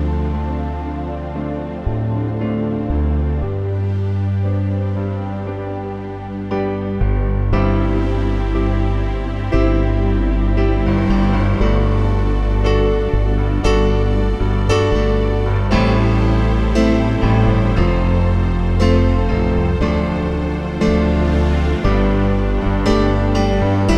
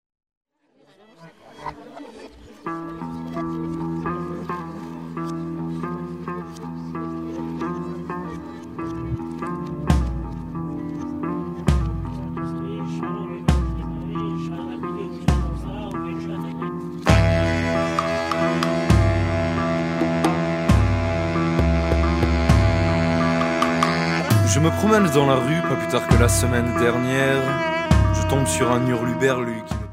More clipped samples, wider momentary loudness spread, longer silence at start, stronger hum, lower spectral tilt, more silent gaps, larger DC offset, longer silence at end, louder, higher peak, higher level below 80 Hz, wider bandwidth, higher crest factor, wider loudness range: neither; second, 8 LU vs 13 LU; second, 0 s vs 1.2 s; neither; first, -8 dB/octave vs -6 dB/octave; neither; first, 0.1% vs under 0.1%; about the same, 0 s vs 0 s; first, -18 LUFS vs -22 LUFS; about the same, -2 dBFS vs 0 dBFS; first, -20 dBFS vs -30 dBFS; second, 8.2 kHz vs 16 kHz; second, 14 dB vs 22 dB; second, 5 LU vs 12 LU